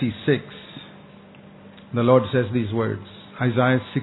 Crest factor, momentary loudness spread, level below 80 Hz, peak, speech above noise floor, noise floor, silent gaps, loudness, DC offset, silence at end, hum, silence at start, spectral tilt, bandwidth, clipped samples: 20 dB; 22 LU; -60 dBFS; -2 dBFS; 25 dB; -46 dBFS; none; -22 LUFS; under 0.1%; 0 s; none; 0 s; -11 dB/octave; 4.1 kHz; under 0.1%